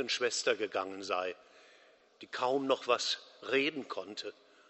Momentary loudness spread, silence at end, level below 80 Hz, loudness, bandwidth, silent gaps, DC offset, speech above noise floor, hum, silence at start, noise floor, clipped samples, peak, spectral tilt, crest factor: 12 LU; 0.4 s; -84 dBFS; -34 LUFS; 8.2 kHz; none; under 0.1%; 29 dB; none; 0 s; -63 dBFS; under 0.1%; -14 dBFS; -2 dB/octave; 22 dB